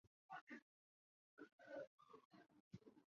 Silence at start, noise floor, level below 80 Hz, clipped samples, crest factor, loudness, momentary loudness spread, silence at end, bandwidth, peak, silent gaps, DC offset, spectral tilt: 0.05 s; under -90 dBFS; under -90 dBFS; under 0.1%; 20 dB; -62 LUFS; 11 LU; 0.1 s; 7 kHz; -44 dBFS; 0.07-0.29 s, 0.41-0.47 s, 0.62-1.37 s, 1.52-1.59 s, 1.87-1.98 s, 2.25-2.31 s, 2.60-2.71 s; under 0.1%; -4.5 dB/octave